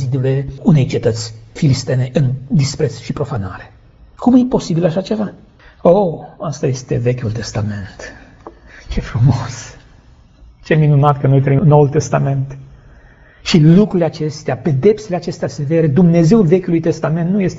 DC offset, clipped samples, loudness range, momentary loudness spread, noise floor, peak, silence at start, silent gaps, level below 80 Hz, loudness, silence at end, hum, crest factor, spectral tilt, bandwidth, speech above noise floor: under 0.1%; under 0.1%; 7 LU; 15 LU; -44 dBFS; 0 dBFS; 0 s; none; -38 dBFS; -15 LUFS; 0 s; none; 14 dB; -7.5 dB/octave; 8 kHz; 31 dB